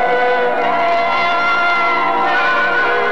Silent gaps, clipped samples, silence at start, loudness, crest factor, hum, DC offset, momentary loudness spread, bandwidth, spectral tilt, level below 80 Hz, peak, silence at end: none; under 0.1%; 0 s; -14 LUFS; 8 dB; none; 5%; 1 LU; 8.8 kHz; -4 dB/octave; -58 dBFS; -6 dBFS; 0 s